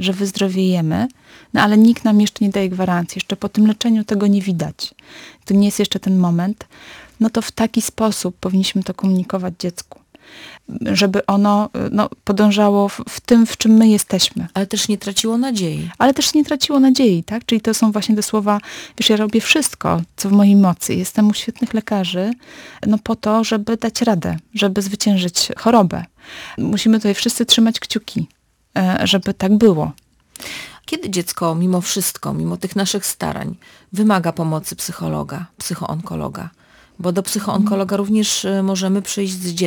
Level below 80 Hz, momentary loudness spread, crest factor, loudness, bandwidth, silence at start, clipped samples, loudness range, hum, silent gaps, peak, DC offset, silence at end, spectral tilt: -50 dBFS; 13 LU; 16 dB; -17 LUFS; over 20 kHz; 0 s; under 0.1%; 5 LU; none; none; -2 dBFS; under 0.1%; 0 s; -4.5 dB/octave